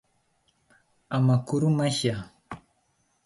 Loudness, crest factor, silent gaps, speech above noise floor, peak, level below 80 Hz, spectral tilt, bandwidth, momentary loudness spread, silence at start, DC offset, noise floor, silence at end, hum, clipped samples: -25 LUFS; 18 dB; none; 46 dB; -10 dBFS; -60 dBFS; -6 dB/octave; 11.5 kHz; 21 LU; 1.1 s; under 0.1%; -70 dBFS; 0.65 s; none; under 0.1%